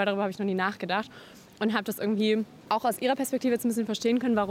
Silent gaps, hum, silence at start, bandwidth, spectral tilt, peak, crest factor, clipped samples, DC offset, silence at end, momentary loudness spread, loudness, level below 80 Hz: none; none; 0 s; 16.5 kHz; -5 dB/octave; -12 dBFS; 16 dB; under 0.1%; under 0.1%; 0 s; 5 LU; -28 LUFS; -70 dBFS